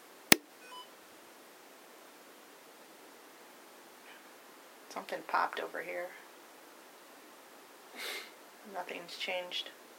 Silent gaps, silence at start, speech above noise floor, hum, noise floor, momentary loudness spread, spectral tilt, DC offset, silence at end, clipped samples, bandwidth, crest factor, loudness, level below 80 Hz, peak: none; 0 s; 17 dB; none; -56 dBFS; 21 LU; -1.5 dB/octave; under 0.1%; 0 s; under 0.1%; over 20 kHz; 38 dB; -34 LUFS; -80 dBFS; -2 dBFS